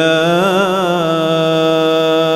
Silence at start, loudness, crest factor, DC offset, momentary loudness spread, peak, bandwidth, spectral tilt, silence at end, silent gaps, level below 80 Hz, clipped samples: 0 s; -13 LUFS; 10 dB; under 0.1%; 2 LU; -2 dBFS; 16 kHz; -5.5 dB/octave; 0 s; none; -54 dBFS; under 0.1%